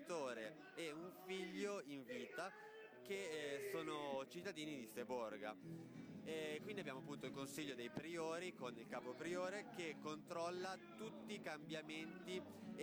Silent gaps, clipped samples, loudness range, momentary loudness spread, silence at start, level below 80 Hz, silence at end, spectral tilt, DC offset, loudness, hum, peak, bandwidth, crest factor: none; under 0.1%; 1 LU; 7 LU; 0 s; under -90 dBFS; 0 s; -4.5 dB/octave; under 0.1%; -50 LUFS; none; -36 dBFS; over 20 kHz; 14 dB